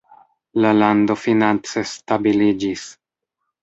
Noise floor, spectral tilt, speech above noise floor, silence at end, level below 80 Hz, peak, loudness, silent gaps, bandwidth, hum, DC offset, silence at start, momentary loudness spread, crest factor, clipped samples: -78 dBFS; -5.5 dB/octave; 61 dB; 0.7 s; -56 dBFS; -2 dBFS; -18 LUFS; none; 8 kHz; none; under 0.1%; 0.55 s; 11 LU; 18 dB; under 0.1%